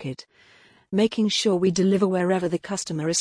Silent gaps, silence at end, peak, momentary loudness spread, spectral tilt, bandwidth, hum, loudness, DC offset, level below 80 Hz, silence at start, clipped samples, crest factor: none; 0 s; -8 dBFS; 8 LU; -4.5 dB/octave; 10.5 kHz; none; -23 LUFS; under 0.1%; -62 dBFS; 0 s; under 0.1%; 16 dB